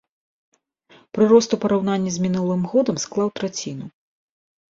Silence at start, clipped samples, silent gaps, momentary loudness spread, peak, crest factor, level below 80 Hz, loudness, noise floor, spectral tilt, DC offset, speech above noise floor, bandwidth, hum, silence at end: 1.15 s; under 0.1%; none; 16 LU; -2 dBFS; 20 dB; -60 dBFS; -20 LUFS; -54 dBFS; -5.5 dB/octave; under 0.1%; 35 dB; 7.8 kHz; none; 0.8 s